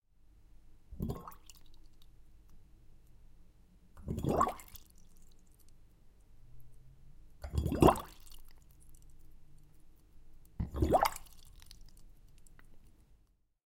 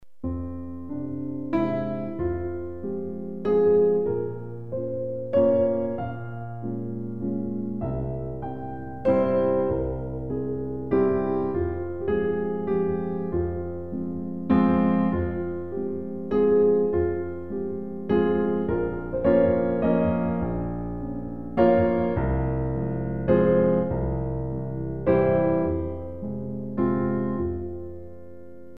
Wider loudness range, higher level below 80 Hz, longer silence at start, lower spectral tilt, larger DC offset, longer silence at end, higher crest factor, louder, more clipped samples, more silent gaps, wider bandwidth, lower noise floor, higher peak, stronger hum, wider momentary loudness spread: first, 15 LU vs 4 LU; second, -48 dBFS vs -42 dBFS; first, 0.9 s vs 0 s; second, -6.5 dB/octave vs -11.5 dB/octave; second, under 0.1% vs 0.9%; first, 1 s vs 0 s; first, 30 dB vs 18 dB; second, -33 LUFS vs -26 LUFS; neither; neither; first, 17 kHz vs 4.7 kHz; first, -69 dBFS vs -45 dBFS; about the same, -8 dBFS vs -6 dBFS; neither; first, 31 LU vs 13 LU